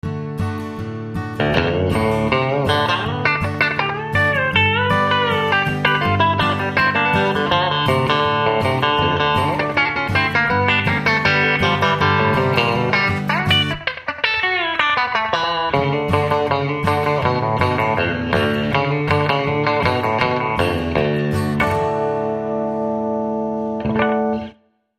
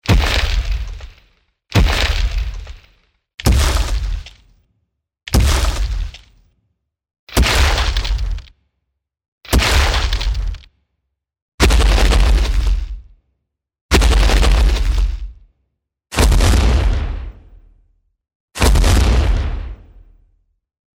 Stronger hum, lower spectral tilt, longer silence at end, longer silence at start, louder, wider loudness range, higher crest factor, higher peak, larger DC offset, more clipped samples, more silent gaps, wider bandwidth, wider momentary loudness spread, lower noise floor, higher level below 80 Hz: neither; first, -6 dB/octave vs -4.5 dB/octave; second, 0.5 s vs 1.2 s; about the same, 0.05 s vs 0.05 s; about the same, -18 LUFS vs -17 LUFS; about the same, 3 LU vs 4 LU; about the same, 18 dB vs 16 dB; about the same, 0 dBFS vs 0 dBFS; neither; neither; second, none vs 3.34-3.38 s, 7.19-7.27 s, 9.28-9.38 s, 11.42-11.58 s, 13.81-13.89 s, 18.35-18.48 s; about the same, 15 kHz vs 16.5 kHz; second, 6 LU vs 17 LU; second, -47 dBFS vs -74 dBFS; second, -42 dBFS vs -18 dBFS